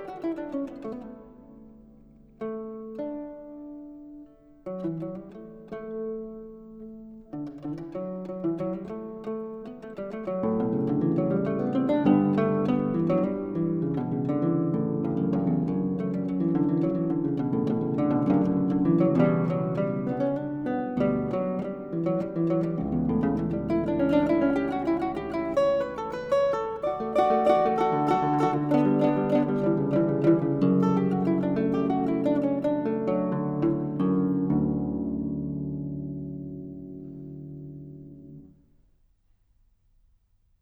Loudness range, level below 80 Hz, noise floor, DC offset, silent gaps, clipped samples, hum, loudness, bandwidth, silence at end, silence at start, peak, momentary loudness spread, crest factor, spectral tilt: 14 LU; -54 dBFS; -65 dBFS; under 0.1%; none; under 0.1%; none; -26 LUFS; 7.6 kHz; 2.15 s; 0 s; -8 dBFS; 18 LU; 18 dB; -9.5 dB/octave